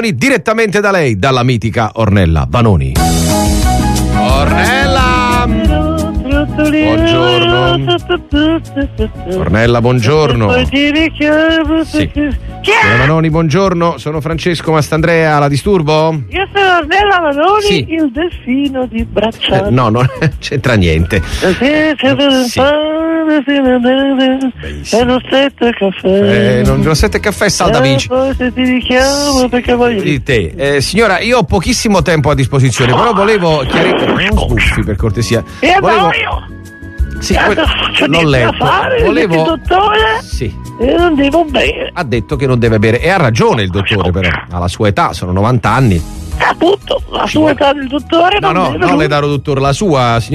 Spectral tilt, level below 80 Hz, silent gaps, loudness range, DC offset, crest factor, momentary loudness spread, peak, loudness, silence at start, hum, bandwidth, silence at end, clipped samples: -5.5 dB/octave; -24 dBFS; none; 2 LU; under 0.1%; 10 dB; 6 LU; 0 dBFS; -11 LUFS; 0 s; none; 13.5 kHz; 0 s; under 0.1%